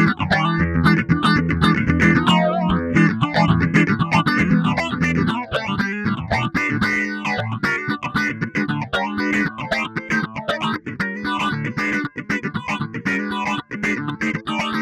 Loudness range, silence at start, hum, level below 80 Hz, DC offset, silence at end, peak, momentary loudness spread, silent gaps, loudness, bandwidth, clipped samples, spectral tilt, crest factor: 6 LU; 0 s; none; -40 dBFS; under 0.1%; 0 s; -2 dBFS; 7 LU; none; -20 LUFS; 12 kHz; under 0.1%; -6 dB/octave; 16 dB